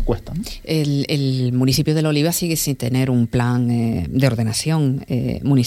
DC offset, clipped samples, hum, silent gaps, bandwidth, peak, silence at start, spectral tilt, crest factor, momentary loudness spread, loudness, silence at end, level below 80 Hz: under 0.1%; under 0.1%; none; none; 16 kHz; -2 dBFS; 0 s; -5.5 dB/octave; 16 dB; 5 LU; -19 LUFS; 0 s; -36 dBFS